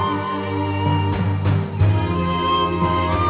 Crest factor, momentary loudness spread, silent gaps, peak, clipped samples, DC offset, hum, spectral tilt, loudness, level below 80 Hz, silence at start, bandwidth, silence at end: 12 dB; 4 LU; none; -6 dBFS; under 0.1%; under 0.1%; none; -11 dB/octave; -20 LUFS; -32 dBFS; 0 s; 4 kHz; 0 s